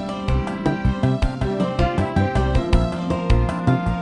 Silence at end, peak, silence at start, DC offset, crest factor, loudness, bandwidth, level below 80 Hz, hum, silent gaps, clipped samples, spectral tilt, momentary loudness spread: 0 s; -4 dBFS; 0 s; under 0.1%; 16 dB; -21 LUFS; 10.5 kHz; -24 dBFS; none; none; under 0.1%; -7.5 dB/octave; 4 LU